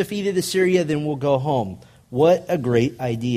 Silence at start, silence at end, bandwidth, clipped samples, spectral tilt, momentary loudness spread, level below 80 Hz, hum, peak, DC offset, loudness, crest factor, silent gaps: 0 s; 0 s; 15.5 kHz; under 0.1%; -6 dB/octave; 7 LU; -54 dBFS; none; -4 dBFS; under 0.1%; -21 LUFS; 16 dB; none